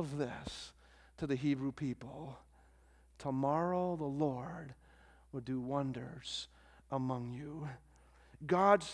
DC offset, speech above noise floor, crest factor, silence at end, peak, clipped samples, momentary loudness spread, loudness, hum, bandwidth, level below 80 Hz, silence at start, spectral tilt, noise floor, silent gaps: under 0.1%; 28 dB; 24 dB; 0 s; -14 dBFS; under 0.1%; 16 LU; -38 LUFS; none; 11 kHz; -64 dBFS; 0 s; -6.5 dB/octave; -65 dBFS; none